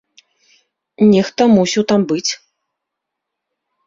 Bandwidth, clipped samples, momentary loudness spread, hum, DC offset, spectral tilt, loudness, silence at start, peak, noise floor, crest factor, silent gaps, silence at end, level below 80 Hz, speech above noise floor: 7.6 kHz; under 0.1%; 8 LU; none; under 0.1%; -5 dB/octave; -14 LUFS; 1 s; -2 dBFS; -79 dBFS; 16 dB; none; 1.5 s; -56 dBFS; 66 dB